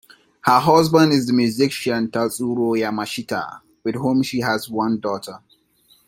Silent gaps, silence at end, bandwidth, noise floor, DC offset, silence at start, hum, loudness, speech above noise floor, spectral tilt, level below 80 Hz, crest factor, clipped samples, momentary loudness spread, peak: none; 0.7 s; 16.5 kHz; -58 dBFS; under 0.1%; 0.45 s; none; -19 LUFS; 39 dB; -5.5 dB/octave; -58 dBFS; 18 dB; under 0.1%; 13 LU; -2 dBFS